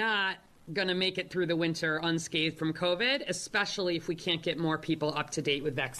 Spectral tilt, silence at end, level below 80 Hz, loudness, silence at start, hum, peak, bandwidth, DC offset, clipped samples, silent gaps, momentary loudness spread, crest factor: -4 dB/octave; 0 s; -64 dBFS; -31 LUFS; 0 s; none; -14 dBFS; 13 kHz; under 0.1%; under 0.1%; none; 4 LU; 16 dB